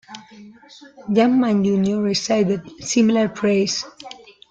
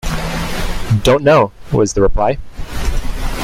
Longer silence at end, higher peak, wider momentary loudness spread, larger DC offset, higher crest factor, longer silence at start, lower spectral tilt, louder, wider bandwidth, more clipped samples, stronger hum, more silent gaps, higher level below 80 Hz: first, 0.35 s vs 0 s; second, -6 dBFS vs -2 dBFS; first, 21 LU vs 13 LU; neither; about the same, 14 dB vs 14 dB; about the same, 0.1 s vs 0.05 s; about the same, -5 dB/octave vs -5.5 dB/octave; second, -19 LUFS vs -16 LUFS; second, 9 kHz vs 16 kHz; neither; neither; neither; second, -60 dBFS vs -22 dBFS